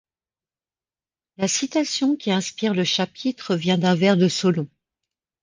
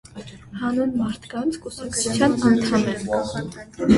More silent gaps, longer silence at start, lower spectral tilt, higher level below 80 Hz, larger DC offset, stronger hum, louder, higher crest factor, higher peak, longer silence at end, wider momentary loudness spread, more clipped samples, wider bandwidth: neither; first, 1.4 s vs 0.15 s; about the same, -4.5 dB/octave vs -5 dB/octave; second, -66 dBFS vs -46 dBFS; neither; neither; about the same, -21 LUFS vs -22 LUFS; about the same, 18 dB vs 18 dB; about the same, -4 dBFS vs -4 dBFS; first, 0.75 s vs 0 s; second, 8 LU vs 15 LU; neither; second, 10 kHz vs 11.5 kHz